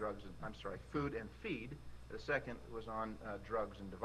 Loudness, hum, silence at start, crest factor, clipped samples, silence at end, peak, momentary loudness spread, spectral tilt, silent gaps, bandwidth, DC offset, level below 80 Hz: -44 LUFS; none; 0 s; 22 dB; under 0.1%; 0 s; -22 dBFS; 9 LU; -6.5 dB/octave; none; 13 kHz; under 0.1%; -58 dBFS